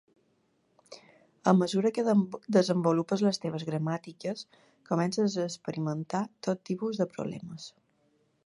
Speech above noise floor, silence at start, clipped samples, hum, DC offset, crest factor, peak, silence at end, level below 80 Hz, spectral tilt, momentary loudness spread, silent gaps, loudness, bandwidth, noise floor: 42 dB; 0.9 s; under 0.1%; none; under 0.1%; 22 dB; -8 dBFS; 0.75 s; -76 dBFS; -6.5 dB/octave; 12 LU; none; -30 LUFS; 11.5 kHz; -71 dBFS